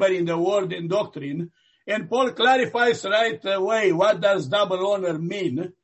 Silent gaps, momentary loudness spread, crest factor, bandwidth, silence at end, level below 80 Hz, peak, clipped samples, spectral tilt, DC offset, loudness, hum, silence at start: none; 10 LU; 16 dB; 8.4 kHz; 0.1 s; -68 dBFS; -8 dBFS; under 0.1%; -5 dB/octave; under 0.1%; -22 LUFS; none; 0 s